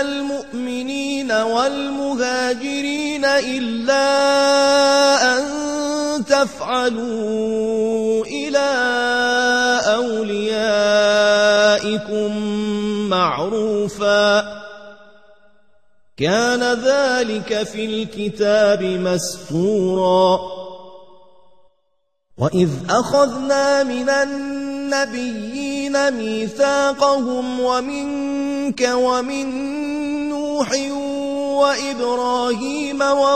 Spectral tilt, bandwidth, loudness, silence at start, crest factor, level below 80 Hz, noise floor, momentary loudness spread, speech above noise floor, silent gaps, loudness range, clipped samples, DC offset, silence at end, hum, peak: -4 dB/octave; 13.5 kHz; -18 LUFS; 0 s; 16 dB; -56 dBFS; -71 dBFS; 9 LU; 53 dB; none; 5 LU; under 0.1%; 0.4%; 0 s; none; -2 dBFS